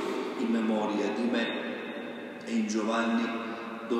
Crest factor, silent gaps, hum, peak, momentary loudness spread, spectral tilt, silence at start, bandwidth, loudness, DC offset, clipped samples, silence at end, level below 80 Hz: 14 dB; none; none; -16 dBFS; 10 LU; -5 dB/octave; 0 s; 11 kHz; -31 LUFS; under 0.1%; under 0.1%; 0 s; -80 dBFS